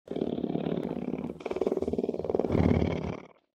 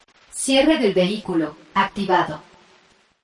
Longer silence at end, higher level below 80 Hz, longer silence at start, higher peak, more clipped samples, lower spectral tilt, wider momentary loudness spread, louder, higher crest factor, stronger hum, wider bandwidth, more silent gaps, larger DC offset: second, 0.3 s vs 0.85 s; first, -46 dBFS vs -54 dBFS; second, 0.05 s vs 0.35 s; second, -10 dBFS vs -6 dBFS; neither; first, -9 dB/octave vs -4 dB/octave; about the same, 10 LU vs 11 LU; second, -31 LUFS vs -20 LUFS; first, 22 dB vs 16 dB; neither; second, 8.8 kHz vs 11.5 kHz; neither; neither